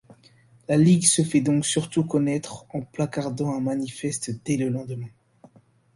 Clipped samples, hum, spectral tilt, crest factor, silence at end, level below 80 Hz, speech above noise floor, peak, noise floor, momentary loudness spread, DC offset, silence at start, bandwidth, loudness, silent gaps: under 0.1%; none; -5 dB/octave; 22 dB; 0.85 s; -60 dBFS; 33 dB; -2 dBFS; -56 dBFS; 16 LU; under 0.1%; 0.7 s; 11.5 kHz; -23 LUFS; none